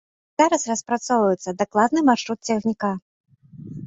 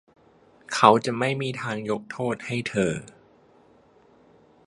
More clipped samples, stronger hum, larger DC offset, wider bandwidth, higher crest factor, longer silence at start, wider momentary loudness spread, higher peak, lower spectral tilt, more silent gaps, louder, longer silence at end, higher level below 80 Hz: neither; neither; neither; second, 8.2 kHz vs 11.5 kHz; second, 18 dB vs 26 dB; second, 0.4 s vs 0.7 s; second, 9 LU vs 12 LU; second, -4 dBFS vs 0 dBFS; about the same, -4.5 dB/octave vs -5 dB/octave; first, 3.02-3.24 s vs none; first, -21 LUFS vs -24 LUFS; second, 0 s vs 1.55 s; about the same, -64 dBFS vs -62 dBFS